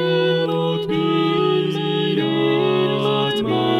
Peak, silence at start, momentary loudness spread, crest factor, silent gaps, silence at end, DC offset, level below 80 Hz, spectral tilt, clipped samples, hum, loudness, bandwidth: -6 dBFS; 0 s; 3 LU; 12 dB; none; 0 s; under 0.1%; -58 dBFS; -7 dB/octave; under 0.1%; none; -19 LUFS; 13 kHz